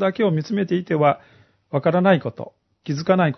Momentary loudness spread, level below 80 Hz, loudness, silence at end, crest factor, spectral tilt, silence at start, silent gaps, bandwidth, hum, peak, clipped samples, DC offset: 16 LU; -66 dBFS; -21 LUFS; 0 s; 18 dB; -7.5 dB/octave; 0 s; none; 6.2 kHz; none; -2 dBFS; under 0.1%; under 0.1%